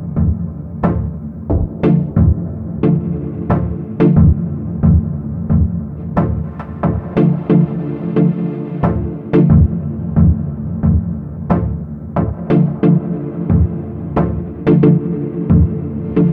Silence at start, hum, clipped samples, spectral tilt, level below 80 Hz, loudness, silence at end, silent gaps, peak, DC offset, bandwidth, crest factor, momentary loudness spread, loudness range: 0 s; none; under 0.1%; -12.5 dB/octave; -26 dBFS; -16 LUFS; 0 s; none; 0 dBFS; under 0.1%; 3.7 kHz; 14 dB; 10 LU; 2 LU